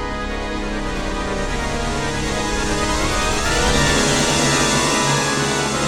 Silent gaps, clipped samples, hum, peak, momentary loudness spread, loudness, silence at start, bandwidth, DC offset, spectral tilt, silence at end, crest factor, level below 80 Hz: none; under 0.1%; none; -4 dBFS; 9 LU; -18 LUFS; 0 s; 18 kHz; under 0.1%; -3 dB/octave; 0 s; 16 dB; -28 dBFS